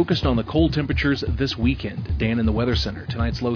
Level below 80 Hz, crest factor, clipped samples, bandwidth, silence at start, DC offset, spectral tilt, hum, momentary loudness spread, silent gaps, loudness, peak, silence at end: -30 dBFS; 16 dB; under 0.1%; 5.4 kHz; 0 s; under 0.1%; -7 dB/octave; none; 6 LU; none; -22 LUFS; -6 dBFS; 0 s